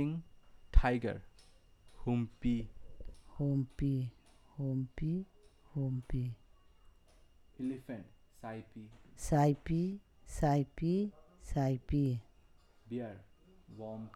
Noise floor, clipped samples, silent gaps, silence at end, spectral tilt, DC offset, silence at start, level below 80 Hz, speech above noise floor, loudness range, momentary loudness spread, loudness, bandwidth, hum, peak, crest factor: -64 dBFS; under 0.1%; none; 0.05 s; -8 dB/octave; under 0.1%; 0 s; -44 dBFS; 29 dB; 8 LU; 21 LU; -37 LUFS; 13 kHz; none; -10 dBFS; 26 dB